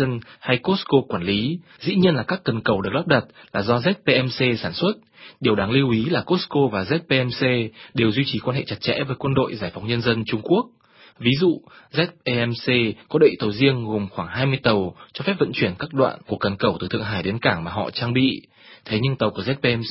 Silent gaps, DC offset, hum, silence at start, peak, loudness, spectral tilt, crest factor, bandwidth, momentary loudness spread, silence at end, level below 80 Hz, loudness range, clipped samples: none; under 0.1%; none; 0 s; 0 dBFS; -22 LUFS; -10.5 dB/octave; 20 dB; 5.8 kHz; 7 LU; 0 s; -50 dBFS; 2 LU; under 0.1%